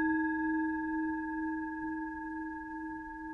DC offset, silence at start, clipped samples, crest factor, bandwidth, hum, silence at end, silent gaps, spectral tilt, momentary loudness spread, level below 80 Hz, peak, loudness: under 0.1%; 0 s; under 0.1%; 14 dB; 3.9 kHz; none; 0 s; none; -8 dB/octave; 9 LU; -60 dBFS; -22 dBFS; -36 LUFS